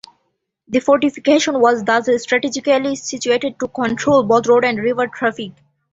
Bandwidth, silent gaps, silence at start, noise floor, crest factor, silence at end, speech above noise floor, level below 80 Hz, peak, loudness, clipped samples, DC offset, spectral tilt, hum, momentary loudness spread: 8 kHz; none; 0.7 s; -70 dBFS; 16 dB; 0.4 s; 54 dB; -56 dBFS; -2 dBFS; -16 LUFS; under 0.1%; under 0.1%; -4 dB/octave; none; 8 LU